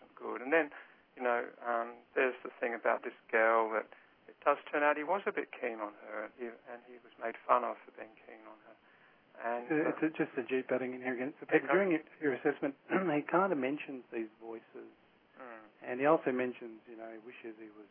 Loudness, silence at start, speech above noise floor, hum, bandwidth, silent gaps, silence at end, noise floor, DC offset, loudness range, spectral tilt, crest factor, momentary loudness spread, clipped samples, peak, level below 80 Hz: -34 LUFS; 0.2 s; 30 dB; none; 3.6 kHz; none; 0.05 s; -64 dBFS; under 0.1%; 5 LU; -4 dB/octave; 24 dB; 21 LU; under 0.1%; -12 dBFS; under -90 dBFS